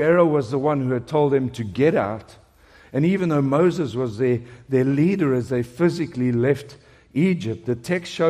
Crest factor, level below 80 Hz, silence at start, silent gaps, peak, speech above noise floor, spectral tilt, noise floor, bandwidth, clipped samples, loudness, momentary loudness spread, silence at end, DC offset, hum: 16 dB; -56 dBFS; 0 s; none; -4 dBFS; 31 dB; -8 dB/octave; -51 dBFS; 13 kHz; under 0.1%; -21 LUFS; 8 LU; 0 s; under 0.1%; none